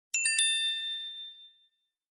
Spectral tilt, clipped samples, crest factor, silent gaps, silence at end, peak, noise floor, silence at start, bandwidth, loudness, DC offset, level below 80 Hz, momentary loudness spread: 7.5 dB/octave; under 0.1%; 20 dB; none; 0.65 s; -14 dBFS; -73 dBFS; 0.15 s; 11.5 kHz; -28 LUFS; under 0.1%; -86 dBFS; 17 LU